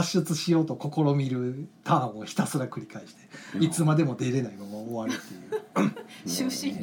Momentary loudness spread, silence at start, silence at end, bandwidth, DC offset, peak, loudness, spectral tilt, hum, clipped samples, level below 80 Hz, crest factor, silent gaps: 13 LU; 0 s; 0 s; 18.5 kHz; under 0.1%; -10 dBFS; -28 LUFS; -5.5 dB/octave; none; under 0.1%; -72 dBFS; 18 dB; none